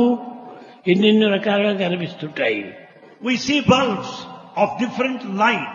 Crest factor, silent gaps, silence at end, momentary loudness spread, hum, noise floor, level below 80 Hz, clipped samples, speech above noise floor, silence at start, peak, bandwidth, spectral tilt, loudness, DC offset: 18 dB; none; 0 s; 16 LU; none; -39 dBFS; -58 dBFS; under 0.1%; 21 dB; 0 s; -2 dBFS; 7.4 kHz; -5.5 dB/octave; -19 LUFS; under 0.1%